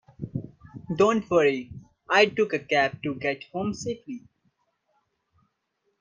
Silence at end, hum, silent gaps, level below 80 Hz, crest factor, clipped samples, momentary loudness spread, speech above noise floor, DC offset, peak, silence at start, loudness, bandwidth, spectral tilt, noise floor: 1.85 s; none; none; -62 dBFS; 22 dB; under 0.1%; 20 LU; 51 dB; under 0.1%; -6 dBFS; 0.2 s; -25 LUFS; 7.6 kHz; -5 dB/octave; -75 dBFS